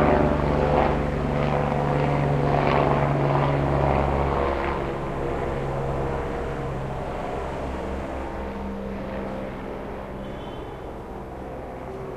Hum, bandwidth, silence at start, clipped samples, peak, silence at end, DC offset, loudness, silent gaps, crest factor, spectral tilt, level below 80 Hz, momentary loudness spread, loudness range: none; 9.6 kHz; 0 s; under 0.1%; -4 dBFS; 0 s; under 0.1%; -25 LUFS; none; 20 dB; -8 dB/octave; -34 dBFS; 14 LU; 11 LU